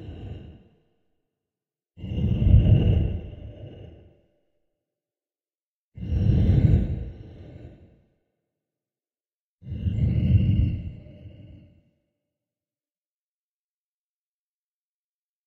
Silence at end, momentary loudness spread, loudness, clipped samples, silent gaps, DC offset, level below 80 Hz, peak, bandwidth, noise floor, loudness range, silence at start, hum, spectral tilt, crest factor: 4 s; 24 LU; -23 LUFS; under 0.1%; 5.63-5.92 s, 9.36-9.58 s; under 0.1%; -32 dBFS; -6 dBFS; 4.2 kHz; under -90 dBFS; 9 LU; 0 s; none; -10.5 dB/octave; 22 dB